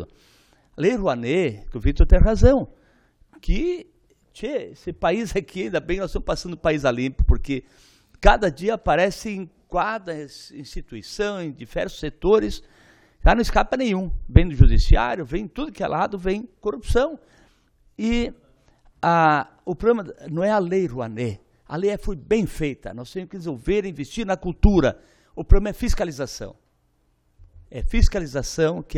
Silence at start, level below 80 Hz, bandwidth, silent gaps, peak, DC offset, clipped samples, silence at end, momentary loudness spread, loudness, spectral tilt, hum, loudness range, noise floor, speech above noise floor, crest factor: 0 s; -26 dBFS; 12 kHz; none; 0 dBFS; under 0.1%; under 0.1%; 0 s; 16 LU; -23 LUFS; -6.5 dB/octave; none; 6 LU; -65 dBFS; 45 dB; 22 dB